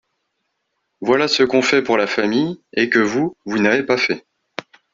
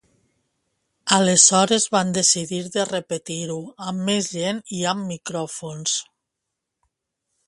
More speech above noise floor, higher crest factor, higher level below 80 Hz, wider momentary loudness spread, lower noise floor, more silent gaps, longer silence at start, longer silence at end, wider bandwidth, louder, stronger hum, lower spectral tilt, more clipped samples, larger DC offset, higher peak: second, 56 dB vs 60 dB; second, 18 dB vs 24 dB; about the same, -60 dBFS vs -64 dBFS; about the same, 14 LU vs 16 LU; second, -73 dBFS vs -81 dBFS; neither; about the same, 1 s vs 1.05 s; second, 0.3 s vs 1.45 s; second, 7.6 kHz vs 11.5 kHz; first, -17 LUFS vs -20 LUFS; neither; first, -4.5 dB/octave vs -2.5 dB/octave; neither; neither; about the same, 0 dBFS vs 0 dBFS